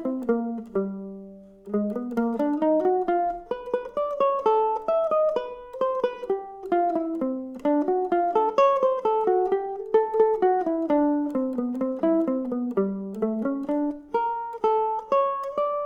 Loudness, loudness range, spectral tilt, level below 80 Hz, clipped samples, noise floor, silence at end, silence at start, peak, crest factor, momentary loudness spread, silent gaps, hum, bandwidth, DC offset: -25 LUFS; 4 LU; -8 dB/octave; -60 dBFS; under 0.1%; -44 dBFS; 0 s; 0 s; -8 dBFS; 16 dB; 8 LU; none; none; 7 kHz; under 0.1%